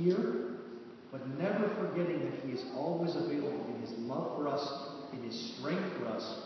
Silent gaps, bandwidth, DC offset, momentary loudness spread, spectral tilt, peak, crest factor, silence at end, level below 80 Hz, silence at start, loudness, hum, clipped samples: none; 6.2 kHz; under 0.1%; 10 LU; -5.5 dB/octave; -18 dBFS; 18 dB; 0 s; -82 dBFS; 0 s; -37 LUFS; none; under 0.1%